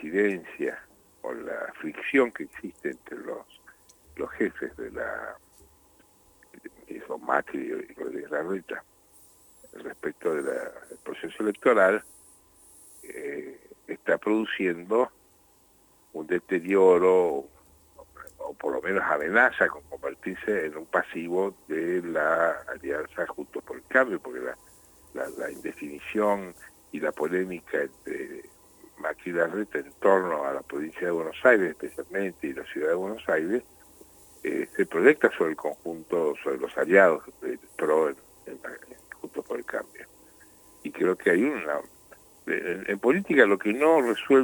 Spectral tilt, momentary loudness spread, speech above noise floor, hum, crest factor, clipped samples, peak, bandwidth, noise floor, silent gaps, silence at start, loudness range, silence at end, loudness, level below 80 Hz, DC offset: -5.5 dB/octave; 19 LU; 34 dB; none; 24 dB; under 0.1%; -4 dBFS; over 20 kHz; -60 dBFS; none; 0 s; 9 LU; 0 s; -27 LUFS; -66 dBFS; under 0.1%